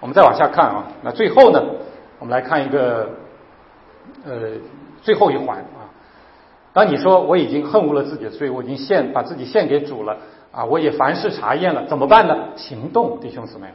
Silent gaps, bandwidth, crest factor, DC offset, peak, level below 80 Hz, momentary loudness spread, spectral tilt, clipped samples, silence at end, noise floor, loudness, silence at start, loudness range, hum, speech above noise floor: none; 5.8 kHz; 18 dB; under 0.1%; 0 dBFS; -58 dBFS; 19 LU; -8 dB/octave; under 0.1%; 0.05 s; -48 dBFS; -17 LUFS; 0 s; 6 LU; none; 31 dB